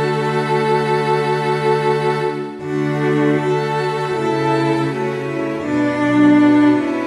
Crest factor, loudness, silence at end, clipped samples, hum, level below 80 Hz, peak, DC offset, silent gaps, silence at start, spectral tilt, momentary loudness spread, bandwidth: 14 dB; -17 LUFS; 0 s; under 0.1%; none; -56 dBFS; -2 dBFS; under 0.1%; none; 0 s; -7 dB/octave; 9 LU; 11.5 kHz